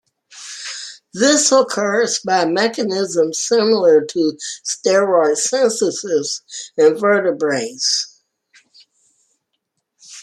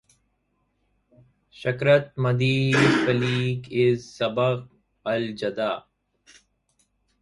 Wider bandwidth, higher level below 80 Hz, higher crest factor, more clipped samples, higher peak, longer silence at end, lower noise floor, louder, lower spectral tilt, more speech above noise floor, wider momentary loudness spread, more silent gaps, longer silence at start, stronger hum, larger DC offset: first, 13 kHz vs 11.5 kHz; second, -70 dBFS vs -60 dBFS; about the same, 16 dB vs 18 dB; neither; first, -2 dBFS vs -6 dBFS; second, 0 s vs 1.4 s; about the same, -73 dBFS vs -72 dBFS; first, -16 LUFS vs -23 LUFS; second, -2.5 dB/octave vs -6.5 dB/octave; first, 57 dB vs 49 dB; first, 14 LU vs 10 LU; neither; second, 0.35 s vs 1.6 s; neither; neither